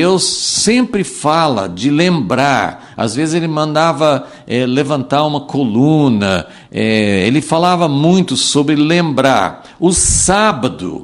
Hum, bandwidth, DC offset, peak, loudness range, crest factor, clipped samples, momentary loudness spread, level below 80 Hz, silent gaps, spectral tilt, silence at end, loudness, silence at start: none; 12 kHz; under 0.1%; 0 dBFS; 3 LU; 12 dB; under 0.1%; 7 LU; -36 dBFS; none; -4.5 dB/octave; 0 s; -13 LUFS; 0 s